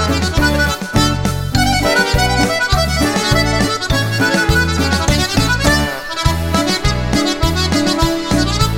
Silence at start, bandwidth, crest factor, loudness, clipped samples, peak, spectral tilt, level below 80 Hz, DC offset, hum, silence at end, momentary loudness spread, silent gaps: 0 s; 16.5 kHz; 14 dB; -14 LUFS; under 0.1%; 0 dBFS; -4 dB/octave; -22 dBFS; under 0.1%; none; 0 s; 3 LU; none